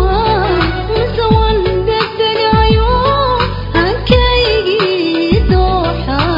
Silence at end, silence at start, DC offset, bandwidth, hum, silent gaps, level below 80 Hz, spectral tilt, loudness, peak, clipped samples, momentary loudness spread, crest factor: 0 s; 0 s; under 0.1%; 5.4 kHz; none; none; -20 dBFS; -8 dB/octave; -12 LUFS; 0 dBFS; under 0.1%; 5 LU; 12 dB